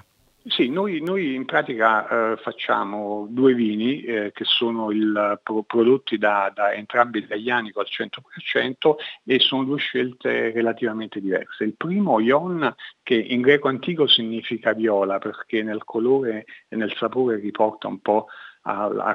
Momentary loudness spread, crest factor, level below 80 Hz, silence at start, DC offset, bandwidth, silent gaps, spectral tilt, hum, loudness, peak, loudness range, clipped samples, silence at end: 9 LU; 20 dB; -76 dBFS; 0.45 s; under 0.1%; 6.6 kHz; none; -7 dB/octave; none; -22 LUFS; -2 dBFS; 3 LU; under 0.1%; 0 s